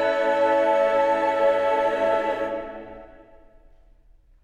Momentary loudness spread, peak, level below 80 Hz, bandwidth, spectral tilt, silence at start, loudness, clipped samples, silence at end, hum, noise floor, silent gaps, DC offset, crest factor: 14 LU; -10 dBFS; -54 dBFS; 9.4 kHz; -4.5 dB/octave; 0 s; -22 LUFS; under 0.1%; 1.4 s; none; -54 dBFS; none; under 0.1%; 14 dB